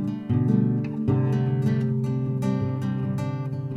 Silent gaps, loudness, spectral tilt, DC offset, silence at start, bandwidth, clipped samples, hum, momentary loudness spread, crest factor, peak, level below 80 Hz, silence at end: none; -25 LUFS; -9.5 dB/octave; under 0.1%; 0 s; 6.6 kHz; under 0.1%; none; 5 LU; 14 dB; -8 dBFS; -52 dBFS; 0 s